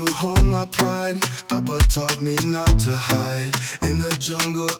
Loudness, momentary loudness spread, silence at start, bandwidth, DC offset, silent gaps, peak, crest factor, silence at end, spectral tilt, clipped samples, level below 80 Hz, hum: -21 LUFS; 5 LU; 0 s; 19.5 kHz; under 0.1%; none; -6 dBFS; 14 dB; 0 s; -4.5 dB/octave; under 0.1%; -26 dBFS; none